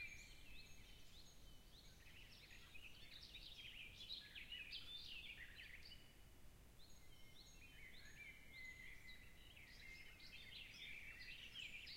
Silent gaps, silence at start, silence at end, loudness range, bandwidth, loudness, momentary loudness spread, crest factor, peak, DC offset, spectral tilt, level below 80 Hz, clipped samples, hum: none; 0 s; 0 s; 6 LU; 16 kHz; -58 LUFS; 12 LU; 18 dB; -40 dBFS; under 0.1%; -2 dB/octave; -68 dBFS; under 0.1%; none